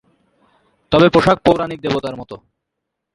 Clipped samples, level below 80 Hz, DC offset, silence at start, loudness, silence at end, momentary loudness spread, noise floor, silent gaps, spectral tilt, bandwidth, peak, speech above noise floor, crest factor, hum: under 0.1%; -44 dBFS; under 0.1%; 0.9 s; -15 LUFS; 0.8 s; 18 LU; -78 dBFS; none; -6.5 dB/octave; 11.5 kHz; 0 dBFS; 63 dB; 18 dB; none